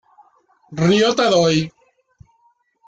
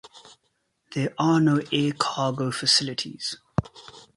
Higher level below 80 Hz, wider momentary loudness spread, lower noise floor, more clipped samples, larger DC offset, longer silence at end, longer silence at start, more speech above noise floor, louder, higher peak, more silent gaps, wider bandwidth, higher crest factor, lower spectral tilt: about the same, -54 dBFS vs -54 dBFS; first, 14 LU vs 11 LU; second, -61 dBFS vs -73 dBFS; neither; neither; first, 1.2 s vs 0.15 s; first, 0.7 s vs 0.05 s; second, 45 dB vs 49 dB; first, -16 LUFS vs -24 LUFS; about the same, -4 dBFS vs -6 dBFS; neither; second, 9 kHz vs 11.5 kHz; about the same, 16 dB vs 20 dB; about the same, -5 dB/octave vs -4.5 dB/octave